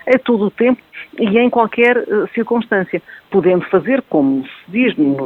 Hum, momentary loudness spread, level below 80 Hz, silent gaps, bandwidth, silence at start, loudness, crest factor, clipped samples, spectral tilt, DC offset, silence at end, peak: none; 9 LU; -58 dBFS; none; 4.7 kHz; 0.05 s; -15 LUFS; 14 dB; under 0.1%; -8.5 dB/octave; under 0.1%; 0 s; 0 dBFS